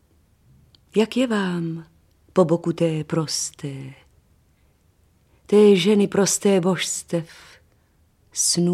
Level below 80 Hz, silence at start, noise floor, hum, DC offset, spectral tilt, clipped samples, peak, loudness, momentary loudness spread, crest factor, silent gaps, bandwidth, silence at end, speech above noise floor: -62 dBFS; 0.95 s; -60 dBFS; none; under 0.1%; -4.5 dB/octave; under 0.1%; -4 dBFS; -20 LUFS; 17 LU; 18 dB; none; 15 kHz; 0 s; 40 dB